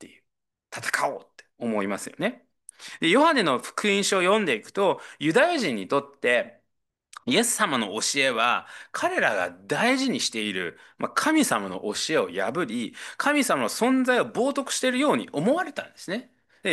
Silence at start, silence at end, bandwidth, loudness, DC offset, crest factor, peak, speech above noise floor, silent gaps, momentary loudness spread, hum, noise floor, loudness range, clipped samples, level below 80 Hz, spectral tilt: 0 s; 0 s; 12.5 kHz; -24 LUFS; under 0.1%; 18 dB; -6 dBFS; 56 dB; none; 12 LU; none; -81 dBFS; 3 LU; under 0.1%; -74 dBFS; -3 dB/octave